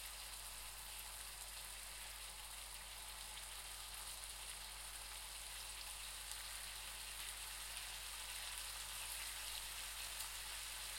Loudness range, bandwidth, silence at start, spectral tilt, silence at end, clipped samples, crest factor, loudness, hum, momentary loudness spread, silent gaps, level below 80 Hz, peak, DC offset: 3 LU; 16.5 kHz; 0 s; 1 dB/octave; 0 s; under 0.1%; 24 dB; -48 LUFS; none; 4 LU; none; -62 dBFS; -26 dBFS; under 0.1%